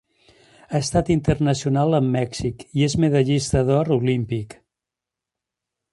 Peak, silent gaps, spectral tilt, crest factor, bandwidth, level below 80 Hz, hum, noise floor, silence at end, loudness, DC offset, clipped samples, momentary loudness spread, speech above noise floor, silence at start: -4 dBFS; none; -6.5 dB/octave; 18 dB; 11.5 kHz; -42 dBFS; none; -87 dBFS; 1.4 s; -21 LUFS; under 0.1%; under 0.1%; 8 LU; 67 dB; 0.7 s